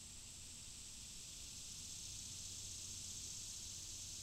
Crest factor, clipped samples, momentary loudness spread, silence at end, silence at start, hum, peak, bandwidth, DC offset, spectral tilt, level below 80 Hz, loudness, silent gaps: 14 dB; under 0.1%; 5 LU; 0 s; 0 s; none; -36 dBFS; 16 kHz; under 0.1%; -0.5 dB/octave; -64 dBFS; -49 LUFS; none